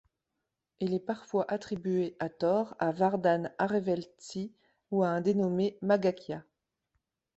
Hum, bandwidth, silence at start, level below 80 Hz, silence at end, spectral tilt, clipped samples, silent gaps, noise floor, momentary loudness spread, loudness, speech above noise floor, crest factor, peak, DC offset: none; 8.2 kHz; 0.8 s; -72 dBFS; 0.95 s; -7 dB/octave; under 0.1%; none; -86 dBFS; 12 LU; -31 LUFS; 56 dB; 18 dB; -14 dBFS; under 0.1%